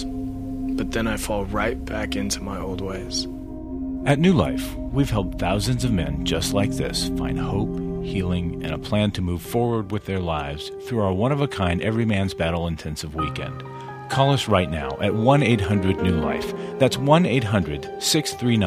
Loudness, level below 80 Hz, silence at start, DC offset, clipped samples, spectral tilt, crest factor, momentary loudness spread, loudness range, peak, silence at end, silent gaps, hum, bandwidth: -23 LUFS; -36 dBFS; 0 s; under 0.1%; under 0.1%; -5.5 dB/octave; 20 dB; 11 LU; 5 LU; -2 dBFS; 0 s; none; none; 16 kHz